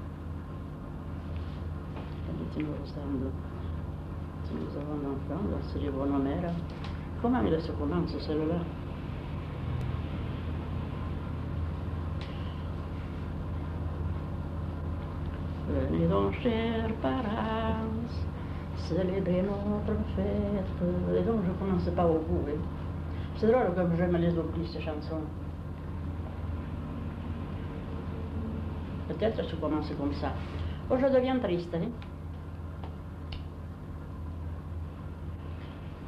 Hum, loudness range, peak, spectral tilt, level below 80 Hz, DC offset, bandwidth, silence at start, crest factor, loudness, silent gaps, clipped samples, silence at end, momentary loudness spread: 50 Hz at -45 dBFS; 8 LU; -12 dBFS; -9 dB/octave; -42 dBFS; under 0.1%; 6.4 kHz; 0 s; 18 dB; -33 LUFS; none; under 0.1%; 0 s; 13 LU